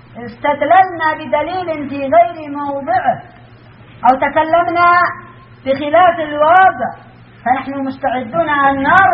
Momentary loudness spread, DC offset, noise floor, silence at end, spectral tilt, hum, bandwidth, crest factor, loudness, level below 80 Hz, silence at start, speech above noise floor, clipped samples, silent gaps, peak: 12 LU; under 0.1%; -40 dBFS; 0 s; -2.5 dB/octave; none; 5.4 kHz; 14 dB; -14 LUFS; -48 dBFS; 0.15 s; 27 dB; under 0.1%; none; 0 dBFS